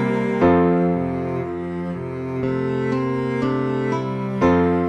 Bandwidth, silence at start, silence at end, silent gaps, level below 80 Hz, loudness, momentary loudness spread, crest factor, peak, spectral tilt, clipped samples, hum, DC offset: 8.4 kHz; 0 s; 0 s; none; -46 dBFS; -21 LUFS; 10 LU; 16 dB; -4 dBFS; -9 dB/octave; under 0.1%; none; under 0.1%